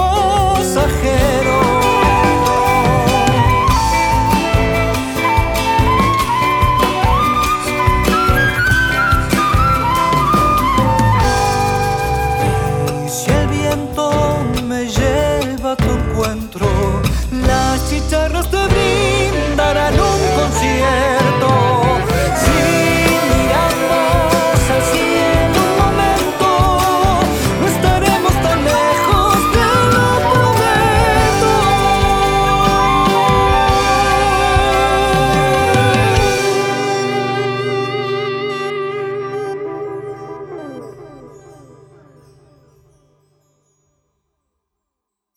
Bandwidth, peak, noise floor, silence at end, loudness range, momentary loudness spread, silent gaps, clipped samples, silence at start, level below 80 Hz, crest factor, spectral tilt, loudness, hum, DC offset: 19.5 kHz; 0 dBFS; -79 dBFS; 3.85 s; 5 LU; 6 LU; none; under 0.1%; 0 s; -24 dBFS; 14 dB; -5 dB/octave; -14 LUFS; none; under 0.1%